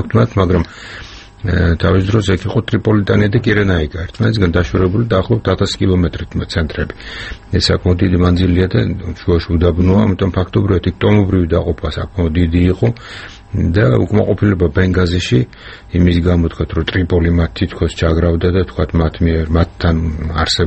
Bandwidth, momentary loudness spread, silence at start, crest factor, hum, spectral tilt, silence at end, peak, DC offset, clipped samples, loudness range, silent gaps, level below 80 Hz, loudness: 8.6 kHz; 9 LU; 0 s; 14 dB; none; -7 dB/octave; 0 s; 0 dBFS; under 0.1%; under 0.1%; 2 LU; none; -26 dBFS; -15 LUFS